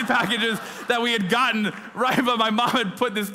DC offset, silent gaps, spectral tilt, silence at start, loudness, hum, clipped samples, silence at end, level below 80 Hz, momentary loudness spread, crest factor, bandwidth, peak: under 0.1%; none; -4 dB/octave; 0 s; -22 LUFS; none; under 0.1%; 0 s; -64 dBFS; 5 LU; 16 dB; 16 kHz; -6 dBFS